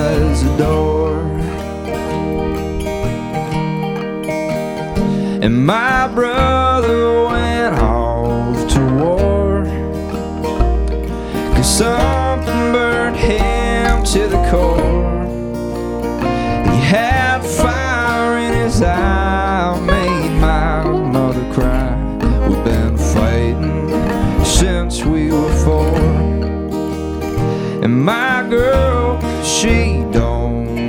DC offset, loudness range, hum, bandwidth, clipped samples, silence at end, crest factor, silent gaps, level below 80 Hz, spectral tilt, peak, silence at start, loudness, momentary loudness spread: under 0.1%; 3 LU; none; 17 kHz; under 0.1%; 0 s; 14 dB; none; -20 dBFS; -5.5 dB/octave; 0 dBFS; 0 s; -16 LUFS; 7 LU